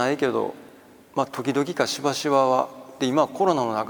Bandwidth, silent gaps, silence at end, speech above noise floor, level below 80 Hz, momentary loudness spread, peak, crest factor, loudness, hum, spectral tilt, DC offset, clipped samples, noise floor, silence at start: over 20 kHz; none; 0 s; 26 dB; -70 dBFS; 8 LU; -6 dBFS; 18 dB; -24 LUFS; none; -4.5 dB/octave; under 0.1%; under 0.1%; -49 dBFS; 0 s